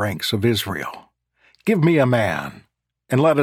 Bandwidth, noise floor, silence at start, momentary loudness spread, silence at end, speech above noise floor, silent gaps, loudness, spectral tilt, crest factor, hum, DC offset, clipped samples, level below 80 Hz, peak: 17 kHz; -60 dBFS; 0 s; 12 LU; 0 s; 41 dB; none; -20 LUFS; -6 dB/octave; 18 dB; none; under 0.1%; under 0.1%; -56 dBFS; -4 dBFS